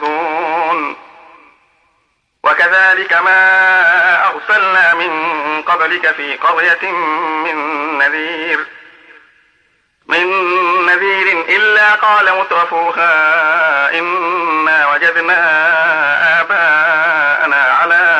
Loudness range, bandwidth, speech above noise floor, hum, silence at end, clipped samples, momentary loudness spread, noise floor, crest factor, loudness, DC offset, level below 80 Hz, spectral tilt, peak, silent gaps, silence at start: 5 LU; 10 kHz; 49 dB; none; 0 s; under 0.1%; 8 LU; -61 dBFS; 12 dB; -11 LUFS; under 0.1%; -70 dBFS; -3 dB/octave; -2 dBFS; none; 0 s